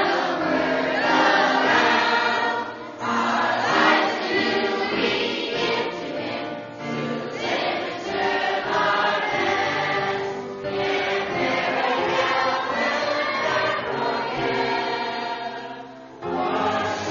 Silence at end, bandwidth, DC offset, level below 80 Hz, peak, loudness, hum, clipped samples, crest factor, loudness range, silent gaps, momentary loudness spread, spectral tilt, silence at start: 0 s; 7.4 kHz; under 0.1%; -60 dBFS; -4 dBFS; -22 LUFS; none; under 0.1%; 18 dB; 5 LU; none; 11 LU; -4 dB/octave; 0 s